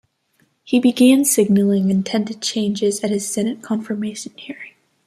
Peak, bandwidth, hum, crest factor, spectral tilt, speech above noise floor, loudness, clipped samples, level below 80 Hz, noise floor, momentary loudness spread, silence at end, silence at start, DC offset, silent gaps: -2 dBFS; 15 kHz; none; 16 dB; -4.5 dB/octave; 45 dB; -18 LUFS; under 0.1%; -64 dBFS; -63 dBFS; 19 LU; 0.4 s; 0.65 s; under 0.1%; none